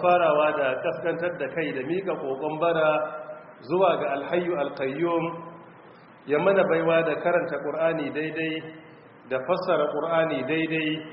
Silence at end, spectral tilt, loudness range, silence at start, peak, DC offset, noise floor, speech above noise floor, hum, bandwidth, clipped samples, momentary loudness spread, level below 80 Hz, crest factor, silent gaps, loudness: 0 s; -4 dB/octave; 2 LU; 0 s; -8 dBFS; under 0.1%; -49 dBFS; 25 dB; none; 5.2 kHz; under 0.1%; 11 LU; -68 dBFS; 18 dB; none; -25 LUFS